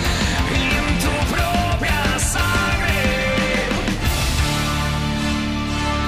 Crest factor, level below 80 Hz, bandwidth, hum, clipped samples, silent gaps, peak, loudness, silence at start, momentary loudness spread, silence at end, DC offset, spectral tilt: 12 dB; -26 dBFS; 16 kHz; none; under 0.1%; none; -8 dBFS; -19 LUFS; 0 s; 3 LU; 0 s; under 0.1%; -4 dB/octave